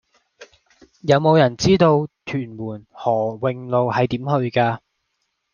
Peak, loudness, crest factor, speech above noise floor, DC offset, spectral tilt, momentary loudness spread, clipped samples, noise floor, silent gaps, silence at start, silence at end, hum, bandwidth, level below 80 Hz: -2 dBFS; -19 LUFS; 18 dB; 55 dB; under 0.1%; -6.5 dB/octave; 14 LU; under 0.1%; -73 dBFS; none; 0.4 s; 0.75 s; none; 7.2 kHz; -52 dBFS